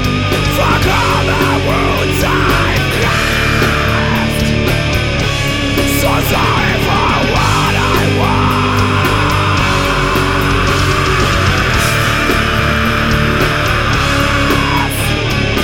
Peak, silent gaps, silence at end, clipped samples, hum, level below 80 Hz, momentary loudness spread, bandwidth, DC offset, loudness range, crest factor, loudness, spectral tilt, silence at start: 0 dBFS; none; 0 s; under 0.1%; none; -22 dBFS; 2 LU; 17.5 kHz; 0.4%; 1 LU; 12 dB; -12 LUFS; -4.5 dB/octave; 0 s